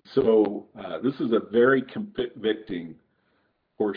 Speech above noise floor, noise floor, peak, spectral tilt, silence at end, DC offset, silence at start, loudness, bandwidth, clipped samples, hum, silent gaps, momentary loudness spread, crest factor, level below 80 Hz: 46 dB; -70 dBFS; -8 dBFS; -9 dB/octave; 0 s; under 0.1%; 0.1 s; -25 LUFS; 5.2 kHz; under 0.1%; none; none; 15 LU; 16 dB; -62 dBFS